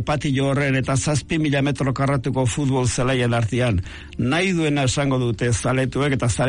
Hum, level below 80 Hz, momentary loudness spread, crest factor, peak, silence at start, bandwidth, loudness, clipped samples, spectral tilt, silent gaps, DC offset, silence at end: none; -40 dBFS; 2 LU; 10 dB; -10 dBFS; 0 s; 11 kHz; -21 LUFS; under 0.1%; -5.5 dB/octave; none; under 0.1%; 0 s